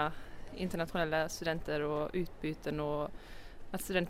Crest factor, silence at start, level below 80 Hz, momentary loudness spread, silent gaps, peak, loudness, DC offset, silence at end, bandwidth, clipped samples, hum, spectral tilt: 18 dB; 0 s; -50 dBFS; 17 LU; none; -18 dBFS; -37 LUFS; under 0.1%; 0 s; 16 kHz; under 0.1%; none; -5 dB/octave